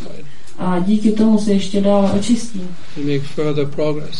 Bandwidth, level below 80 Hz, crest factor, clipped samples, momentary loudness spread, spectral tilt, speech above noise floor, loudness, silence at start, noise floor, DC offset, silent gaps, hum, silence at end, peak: 11.5 kHz; -50 dBFS; 14 dB; under 0.1%; 13 LU; -6.5 dB/octave; 21 dB; -17 LUFS; 0 s; -38 dBFS; 10%; none; none; 0 s; -2 dBFS